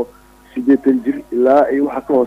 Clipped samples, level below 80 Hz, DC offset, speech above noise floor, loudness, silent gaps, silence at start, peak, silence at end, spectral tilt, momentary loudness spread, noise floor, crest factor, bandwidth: under 0.1%; -52 dBFS; under 0.1%; 29 dB; -15 LUFS; none; 0 s; -2 dBFS; 0 s; -7.5 dB/octave; 11 LU; -43 dBFS; 12 dB; 5.4 kHz